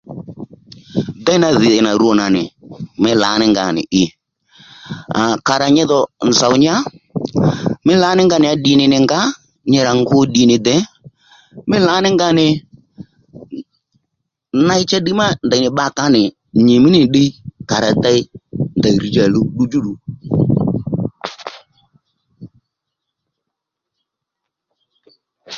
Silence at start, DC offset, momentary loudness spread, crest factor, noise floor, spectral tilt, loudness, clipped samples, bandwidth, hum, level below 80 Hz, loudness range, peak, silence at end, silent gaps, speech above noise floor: 0.1 s; under 0.1%; 17 LU; 16 dB; -80 dBFS; -5 dB/octave; -14 LUFS; under 0.1%; 7.6 kHz; none; -48 dBFS; 5 LU; 0 dBFS; 0 s; none; 67 dB